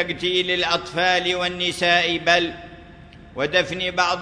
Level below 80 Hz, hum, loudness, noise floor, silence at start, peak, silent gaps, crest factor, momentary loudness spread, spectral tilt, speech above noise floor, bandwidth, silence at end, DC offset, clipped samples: -50 dBFS; none; -20 LUFS; -44 dBFS; 0 s; -2 dBFS; none; 20 dB; 8 LU; -3 dB/octave; 22 dB; 11 kHz; 0 s; under 0.1%; under 0.1%